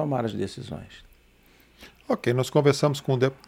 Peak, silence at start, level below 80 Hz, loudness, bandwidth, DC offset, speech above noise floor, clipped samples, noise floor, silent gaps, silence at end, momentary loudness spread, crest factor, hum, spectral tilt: -6 dBFS; 0 s; -58 dBFS; -25 LUFS; 15.5 kHz; under 0.1%; 32 dB; under 0.1%; -58 dBFS; none; 0.15 s; 17 LU; 20 dB; none; -6 dB/octave